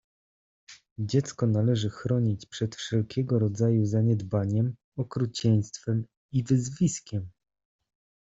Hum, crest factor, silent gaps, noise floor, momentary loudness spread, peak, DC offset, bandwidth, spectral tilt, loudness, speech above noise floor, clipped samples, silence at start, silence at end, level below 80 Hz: none; 16 dB; 0.91-0.96 s, 4.84-4.92 s, 6.17-6.29 s; under -90 dBFS; 9 LU; -12 dBFS; under 0.1%; 7.8 kHz; -7 dB/octave; -28 LUFS; over 64 dB; under 0.1%; 0.7 s; 0.95 s; -60 dBFS